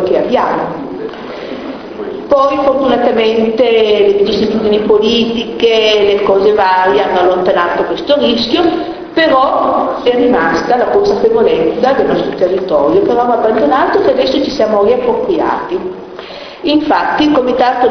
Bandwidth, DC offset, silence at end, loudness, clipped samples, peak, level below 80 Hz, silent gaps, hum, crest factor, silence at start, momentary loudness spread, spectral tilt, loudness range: 6.4 kHz; under 0.1%; 0 s; -11 LUFS; under 0.1%; 0 dBFS; -42 dBFS; none; none; 10 dB; 0 s; 12 LU; -5.5 dB/octave; 3 LU